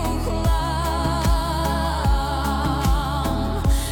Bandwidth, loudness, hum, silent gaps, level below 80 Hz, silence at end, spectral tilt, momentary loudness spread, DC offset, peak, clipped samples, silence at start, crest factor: 18 kHz; -22 LUFS; none; none; -24 dBFS; 0 s; -5.5 dB/octave; 2 LU; under 0.1%; -8 dBFS; under 0.1%; 0 s; 12 dB